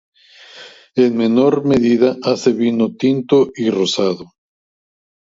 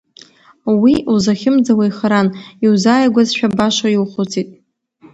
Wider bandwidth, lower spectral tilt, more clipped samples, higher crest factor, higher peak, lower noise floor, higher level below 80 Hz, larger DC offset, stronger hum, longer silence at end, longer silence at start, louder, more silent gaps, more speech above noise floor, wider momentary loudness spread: about the same, 7.8 kHz vs 8.2 kHz; about the same, -6 dB/octave vs -5.5 dB/octave; neither; about the same, 16 dB vs 14 dB; about the same, 0 dBFS vs 0 dBFS; second, -41 dBFS vs -48 dBFS; second, -56 dBFS vs -50 dBFS; neither; neither; first, 1.05 s vs 0.6 s; about the same, 0.55 s vs 0.65 s; about the same, -15 LUFS vs -14 LUFS; neither; second, 26 dB vs 34 dB; second, 5 LU vs 8 LU